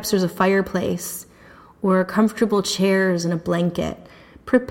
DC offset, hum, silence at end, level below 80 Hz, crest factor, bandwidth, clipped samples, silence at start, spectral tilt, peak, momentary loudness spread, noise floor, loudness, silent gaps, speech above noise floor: under 0.1%; none; 0 s; -52 dBFS; 16 dB; 17 kHz; under 0.1%; 0 s; -5.5 dB/octave; -4 dBFS; 11 LU; -47 dBFS; -21 LUFS; none; 27 dB